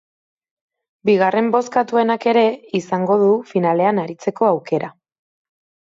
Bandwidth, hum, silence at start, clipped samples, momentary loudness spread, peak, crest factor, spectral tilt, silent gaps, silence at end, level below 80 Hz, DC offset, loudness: 7.8 kHz; none; 1.05 s; under 0.1%; 8 LU; -4 dBFS; 16 dB; -6.5 dB/octave; none; 1 s; -68 dBFS; under 0.1%; -18 LUFS